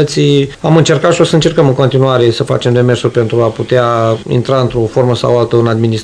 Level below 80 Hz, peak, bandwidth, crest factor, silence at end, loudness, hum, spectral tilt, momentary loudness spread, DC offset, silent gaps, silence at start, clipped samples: -40 dBFS; 0 dBFS; 11 kHz; 10 dB; 0 s; -11 LUFS; none; -6.5 dB/octave; 4 LU; 0.2%; none; 0 s; 2%